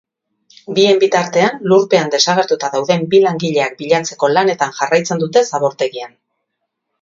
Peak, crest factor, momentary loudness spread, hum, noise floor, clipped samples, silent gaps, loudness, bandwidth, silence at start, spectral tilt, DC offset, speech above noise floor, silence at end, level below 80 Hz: 0 dBFS; 16 dB; 6 LU; none; -74 dBFS; under 0.1%; none; -14 LUFS; 7.6 kHz; 0.7 s; -4 dB/octave; under 0.1%; 60 dB; 0.95 s; -64 dBFS